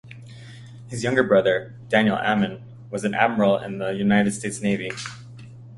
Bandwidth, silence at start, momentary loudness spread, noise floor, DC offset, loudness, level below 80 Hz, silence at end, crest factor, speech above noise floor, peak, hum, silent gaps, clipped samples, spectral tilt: 11.5 kHz; 0.05 s; 23 LU; -41 dBFS; under 0.1%; -22 LUFS; -58 dBFS; 0 s; 22 dB; 20 dB; -2 dBFS; none; none; under 0.1%; -5.5 dB/octave